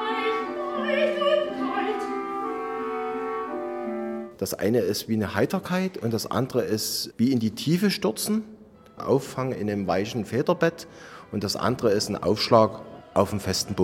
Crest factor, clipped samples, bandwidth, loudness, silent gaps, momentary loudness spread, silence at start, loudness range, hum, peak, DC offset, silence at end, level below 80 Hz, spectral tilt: 22 dB; under 0.1%; 16.5 kHz; -26 LUFS; none; 8 LU; 0 s; 4 LU; none; -4 dBFS; under 0.1%; 0 s; -60 dBFS; -5 dB/octave